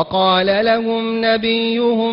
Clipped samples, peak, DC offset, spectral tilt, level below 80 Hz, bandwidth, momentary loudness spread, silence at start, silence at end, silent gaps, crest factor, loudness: under 0.1%; -4 dBFS; under 0.1%; -8.5 dB/octave; -52 dBFS; 5.6 kHz; 3 LU; 0 s; 0 s; none; 12 dB; -16 LUFS